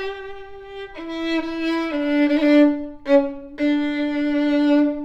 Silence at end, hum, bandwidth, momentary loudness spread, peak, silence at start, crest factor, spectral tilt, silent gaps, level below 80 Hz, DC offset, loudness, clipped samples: 0 s; none; 7.4 kHz; 19 LU; -4 dBFS; 0 s; 16 dB; -5 dB/octave; none; -48 dBFS; under 0.1%; -20 LUFS; under 0.1%